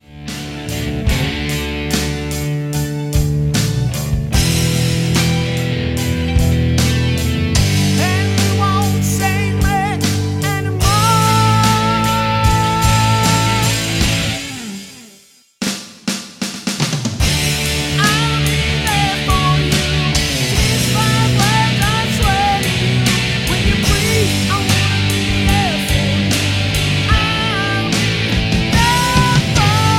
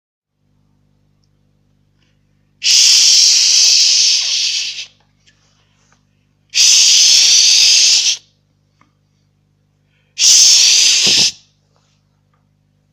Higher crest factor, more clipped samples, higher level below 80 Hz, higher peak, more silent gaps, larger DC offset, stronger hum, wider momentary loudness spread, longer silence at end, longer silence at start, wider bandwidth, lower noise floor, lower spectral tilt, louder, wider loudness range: about the same, 14 dB vs 14 dB; neither; first, -26 dBFS vs -64 dBFS; about the same, 0 dBFS vs 0 dBFS; neither; neither; second, none vs 50 Hz at -60 dBFS; second, 7 LU vs 11 LU; second, 0 s vs 1.6 s; second, 0.1 s vs 2.6 s; second, 16.5 kHz vs over 20 kHz; second, -47 dBFS vs -60 dBFS; first, -4.5 dB/octave vs 3.5 dB/octave; second, -15 LUFS vs -7 LUFS; about the same, 4 LU vs 3 LU